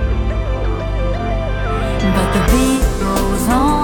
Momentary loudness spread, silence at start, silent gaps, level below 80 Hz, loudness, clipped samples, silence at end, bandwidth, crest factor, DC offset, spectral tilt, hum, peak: 6 LU; 0 s; none; -20 dBFS; -17 LUFS; under 0.1%; 0 s; 19.5 kHz; 14 dB; under 0.1%; -5.5 dB/octave; none; -2 dBFS